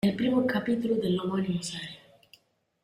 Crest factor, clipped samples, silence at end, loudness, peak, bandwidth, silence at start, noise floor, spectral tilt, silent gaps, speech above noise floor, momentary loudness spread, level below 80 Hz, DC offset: 14 dB; under 0.1%; 0.9 s; -28 LUFS; -14 dBFS; 15 kHz; 0.05 s; -62 dBFS; -6 dB/octave; none; 34 dB; 13 LU; -64 dBFS; under 0.1%